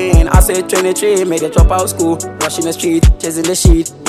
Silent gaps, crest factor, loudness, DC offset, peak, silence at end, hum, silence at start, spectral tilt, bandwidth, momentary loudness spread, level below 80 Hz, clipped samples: none; 12 dB; -13 LUFS; under 0.1%; 0 dBFS; 0 s; none; 0 s; -5 dB/octave; 14.5 kHz; 6 LU; -14 dBFS; 0.8%